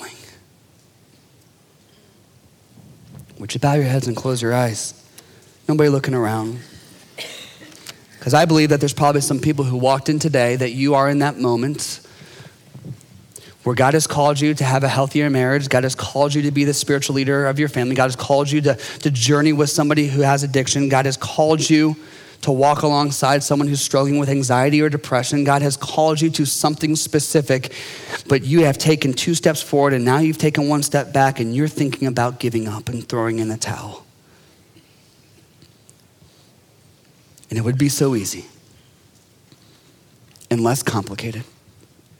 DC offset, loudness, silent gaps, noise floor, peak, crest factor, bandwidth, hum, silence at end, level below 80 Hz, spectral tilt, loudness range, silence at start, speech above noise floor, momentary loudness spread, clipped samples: under 0.1%; -18 LUFS; none; -53 dBFS; 0 dBFS; 18 dB; 17.5 kHz; none; 0.75 s; -60 dBFS; -5 dB/octave; 8 LU; 0 s; 35 dB; 13 LU; under 0.1%